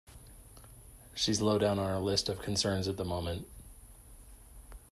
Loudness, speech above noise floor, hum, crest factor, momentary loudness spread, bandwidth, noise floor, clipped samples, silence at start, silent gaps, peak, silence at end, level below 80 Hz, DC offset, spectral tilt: -32 LUFS; 22 dB; none; 18 dB; 25 LU; 13.5 kHz; -54 dBFS; under 0.1%; 0.1 s; none; -16 dBFS; 0.15 s; -54 dBFS; under 0.1%; -4.5 dB/octave